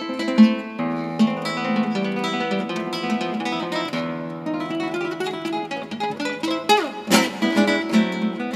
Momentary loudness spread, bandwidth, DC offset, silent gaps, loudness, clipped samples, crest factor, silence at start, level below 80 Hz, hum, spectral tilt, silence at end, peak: 9 LU; 15.5 kHz; under 0.1%; none; -22 LUFS; under 0.1%; 20 dB; 0 s; -68 dBFS; none; -4.5 dB/octave; 0 s; -2 dBFS